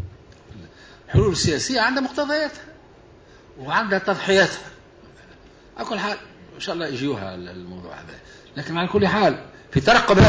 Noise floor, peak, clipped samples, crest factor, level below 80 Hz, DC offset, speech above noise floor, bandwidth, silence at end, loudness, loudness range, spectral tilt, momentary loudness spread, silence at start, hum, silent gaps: -48 dBFS; -6 dBFS; under 0.1%; 18 dB; -40 dBFS; under 0.1%; 28 dB; 8 kHz; 0 s; -21 LUFS; 8 LU; -5 dB/octave; 21 LU; 0 s; none; none